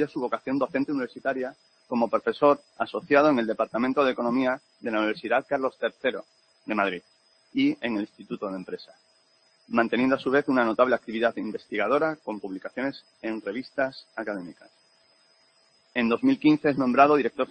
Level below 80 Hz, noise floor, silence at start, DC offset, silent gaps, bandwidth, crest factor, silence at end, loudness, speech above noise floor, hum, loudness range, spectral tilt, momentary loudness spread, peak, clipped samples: -68 dBFS; -64 dBFS; 0 s; under 0.1%; none; 8.6 kHz; 22 dB; 0.05 s; -26 LUFS; 38 dB; none; 6 LU; -7 dB/octave; 13 LU; -4 dBFS; under 0.1%